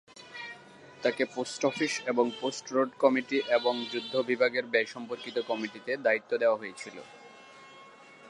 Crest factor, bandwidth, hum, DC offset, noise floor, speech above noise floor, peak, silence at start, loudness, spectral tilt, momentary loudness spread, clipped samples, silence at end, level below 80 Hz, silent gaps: 22 dB; 11 kHz; none; under 0.1%; -52 dBFS; 23 dB; -10 dBFS; 0.15 s; -29 LUFS; -3.5 dB/octave; 21 LU; under 0.1%; 0 s; -82 dBFS; none